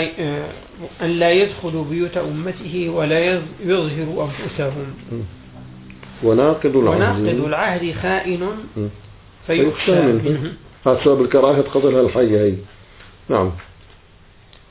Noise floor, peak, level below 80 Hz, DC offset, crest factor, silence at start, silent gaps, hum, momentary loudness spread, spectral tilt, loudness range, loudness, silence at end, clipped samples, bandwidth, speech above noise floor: -47 dBFS; -2 dBFS; -44 dBFS; under 0.1%; 18 dB; 0 s; none; none; 15 LU; -11 dB/octave; 5 LU; -18 LUFS; 1.05 s; under 0.1%; 4 kHz; 29 dB